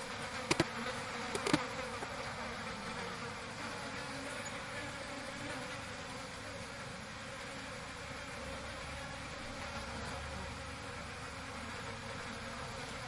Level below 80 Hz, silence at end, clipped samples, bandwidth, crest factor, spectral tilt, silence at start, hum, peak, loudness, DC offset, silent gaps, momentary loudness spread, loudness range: -58 dBFS; 0 s; under 0.1%; 11.5 kHz; 30 dB; -3.5 dB/octave; 0 s; none; -14 dBFS; -41 LUFS; under 0.1%; none; 9 LU; 6 LU